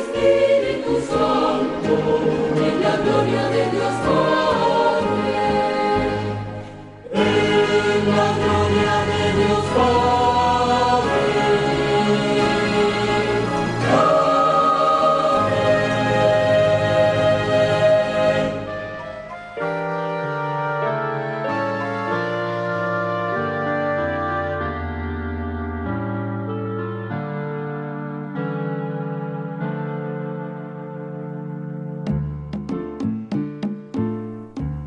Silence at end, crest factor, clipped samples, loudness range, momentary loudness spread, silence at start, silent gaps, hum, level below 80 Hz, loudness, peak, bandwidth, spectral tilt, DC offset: 0 s; 16 dB; under 0.1%; 10 LU; 12 LU; 0 s; none; none; -42 dBFS; -20 LUFS; -4 dBFS; 11 kHz; -6 dB/octave; under 0.1%